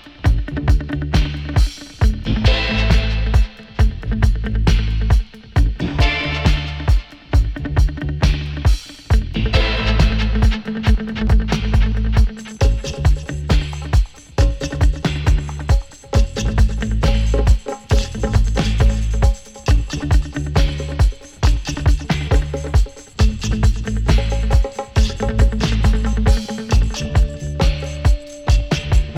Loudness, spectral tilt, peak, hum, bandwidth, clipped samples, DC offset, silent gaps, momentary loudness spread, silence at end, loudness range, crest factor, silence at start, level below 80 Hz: -19 LUFS; -6 dB/octave; 0 dBFS; none; 11 kHz; under 0.1%; under 0.1%; none; 3 LU; 0 s; 1 LU; 16 dB; 0.05 s; -18 dBFS